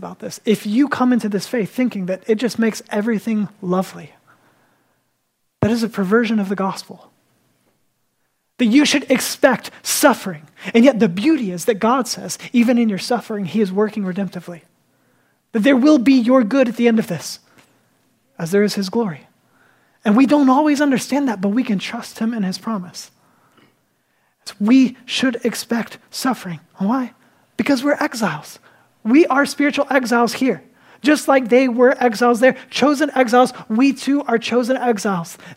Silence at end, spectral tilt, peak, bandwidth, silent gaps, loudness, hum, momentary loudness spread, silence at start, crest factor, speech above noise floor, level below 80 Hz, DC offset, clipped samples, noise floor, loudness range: 0.05 s; -5 dB/octave; 0 dBFS; 16 kHz; none; -17 LUFS; none; 12 LU; 0 s; 18 dB; 53 dB; -66 dBFS; under 0.1%; under 0.1%; -70 dBFS; 6 LU